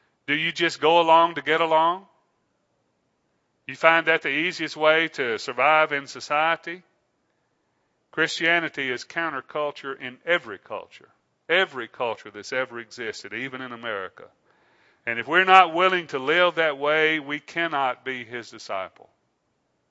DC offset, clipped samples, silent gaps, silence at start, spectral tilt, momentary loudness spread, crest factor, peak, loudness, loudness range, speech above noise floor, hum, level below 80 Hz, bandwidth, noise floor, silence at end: under 0.1%; under 0.1%; none; 0.3 s; -3.5 dB/octave; 15 LU; 24 dB; 0 dBFS; -22 LUFS; 8 LU; 49 dB; none; -80 dBFS; 8 kHz; -72 dBFS; 1.05 s